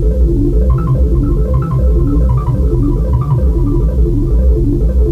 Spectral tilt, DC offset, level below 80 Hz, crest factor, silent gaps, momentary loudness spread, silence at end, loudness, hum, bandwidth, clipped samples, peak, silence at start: -11 dB/octave; under 0.1%; -12 dBFS; 10 dB; none; 1 LU; 0 s; -13 LUFS; none; 2.2 kHz; under 0.1%; -2 dBFS; 0 s